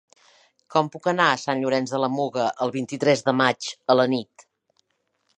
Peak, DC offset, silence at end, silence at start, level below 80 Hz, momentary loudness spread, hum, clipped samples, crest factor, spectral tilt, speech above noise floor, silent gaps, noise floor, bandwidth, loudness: -2 dBFS; under 0.1%; 1.15 s; 0.7 s; -74 dBFS; 6 LU; none; under 0.1%; 22 dB; -4.5 dB/octave; 50 dB; none; -73 dBFS; 10 kHz; -23 LUFS